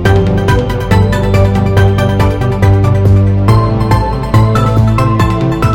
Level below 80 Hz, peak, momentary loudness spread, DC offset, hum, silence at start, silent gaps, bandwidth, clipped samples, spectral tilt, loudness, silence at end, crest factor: -20 dBFS; 0 dBFS; 3 LU; under 0.1%; none; 0 s; none; 13.5 kHz; under 0.1%; -7.5 dB/octave; -10 LUFS; 0 s; 8 dB